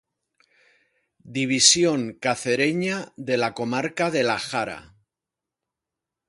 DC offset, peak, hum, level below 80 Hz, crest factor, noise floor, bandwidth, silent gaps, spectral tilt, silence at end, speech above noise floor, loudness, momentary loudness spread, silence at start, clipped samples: under 0.1%; -2 dBFS; none; -64 dBFS; 24 dB; -87 dBFS; 11.5 kHz; none; -2.5 dB/octave; 1.45 s; 64 dB; -22 LUFS; 14 LU; 1.25 s; under 0.1%